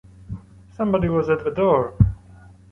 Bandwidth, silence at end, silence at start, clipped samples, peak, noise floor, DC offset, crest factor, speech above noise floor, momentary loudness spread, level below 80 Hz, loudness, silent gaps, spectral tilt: 6.2 kHz; 0.55 s; 0.2 s; under 0.1%; -2 dBFS; -46 dBFS; under 0.1%; 20 dB; 28 dB; 19 LU; -34 dBFS; -21 LUFS; none; -10 dB/octave